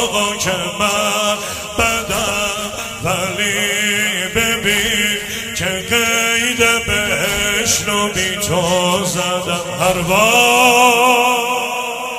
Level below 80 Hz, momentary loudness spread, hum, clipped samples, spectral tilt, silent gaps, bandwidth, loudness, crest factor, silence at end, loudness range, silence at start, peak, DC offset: -40 dBFS; 9 LU; none; under 0.1%; -2 dB/octave; none; 16 kHz; -15 LUFS; 16 dB; 0 s; 4 LU; 0 s; 0 dBFS; under 0.1%